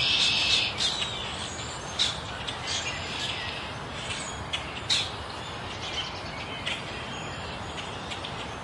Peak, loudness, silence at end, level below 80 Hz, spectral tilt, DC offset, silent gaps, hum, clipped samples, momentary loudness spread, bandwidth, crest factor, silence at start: -12 dBFS; -29 LUFS; 0 s; -50 dBFS; -2 dB/octave; under 0.1%; none; none; under 0.1%; 12 LU; 11.5 kHz; 20 dB; 0 s